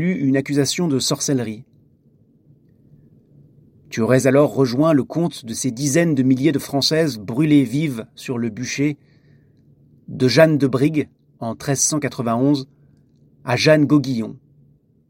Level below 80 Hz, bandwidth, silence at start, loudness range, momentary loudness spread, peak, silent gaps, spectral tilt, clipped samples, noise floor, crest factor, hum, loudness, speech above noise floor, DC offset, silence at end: -60 dBFS; 16.5 kHz; 0 s; 5 LU; 15 LU; 0 dBFS; none; -5 dB/octave; under 0.1%; -55 dBFS; 20 dB; none; -18 LUFS; 38 dB; under 0.1%; 0.75 s